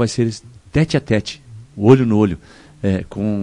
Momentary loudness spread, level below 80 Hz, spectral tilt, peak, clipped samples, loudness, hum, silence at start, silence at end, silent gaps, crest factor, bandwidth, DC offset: 19 LU; -42 dBFS; -7 dB/octave; 0 dBFS; under 0.1%; -17 LUFS; none; 0 s; 0 s; none; 18 dB; 10.5 kHz; under 0.1%